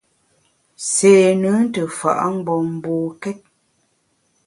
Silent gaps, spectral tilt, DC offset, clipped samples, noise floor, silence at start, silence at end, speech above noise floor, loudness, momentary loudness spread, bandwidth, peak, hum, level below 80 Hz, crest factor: none; -5 dB/octave; under 0.1%; under 0.1%; -65 dBFS; 0.8 s; 1.1 s; 48 dB; -17 LUFS; 16 LU; 11.5 kHz; 0 dBFS; none; -64 dBFS; 18 dB